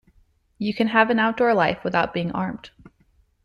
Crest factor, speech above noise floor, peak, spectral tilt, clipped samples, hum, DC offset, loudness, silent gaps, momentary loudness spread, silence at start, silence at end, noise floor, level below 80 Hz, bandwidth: 18 dB; 40 dB; -4 dBFS; -7 dB/octave; under 0.1%; none; under 0.1%; -22 LUFS; none; 11 LU; 0.6 s; 0.75 s; -62 dBFS; -56 dBFS; 11 kHz